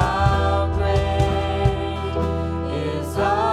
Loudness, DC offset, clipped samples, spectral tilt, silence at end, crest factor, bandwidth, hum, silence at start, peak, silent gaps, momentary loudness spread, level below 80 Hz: -22 LUFS; under 0.1%; under 0.1%; -7 dB/octave; 0 s; 16 dB; 12.5 kHz; none; 0 s; -4 dBFS; none; 6 LU; -30 dBFS